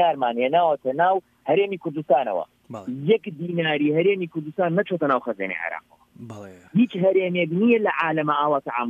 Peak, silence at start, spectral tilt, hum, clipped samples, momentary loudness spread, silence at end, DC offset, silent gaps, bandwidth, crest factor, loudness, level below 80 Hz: -6 dBFS; 0 s; -8 dB/octave; none; under 0.1%; 11 LU; 0 s; under 0.1%; none; 7.4 kHz; 16 dB; -22 LUFS; -72 dBFS